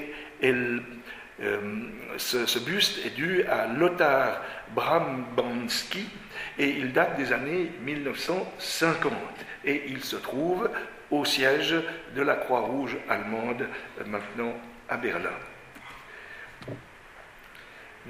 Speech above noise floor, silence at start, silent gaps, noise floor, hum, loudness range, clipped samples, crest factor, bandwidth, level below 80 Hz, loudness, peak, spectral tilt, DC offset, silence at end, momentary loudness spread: 21 dB; 0 s; none; -49 dBFS; none; 9 LU; under 0.1%; 22 dB; 15.5 kHz; -60 dBFS; -28 LUFS; -8 dBFS; -3.5 dB/octave; under 0.1%; 0 s; 19 LU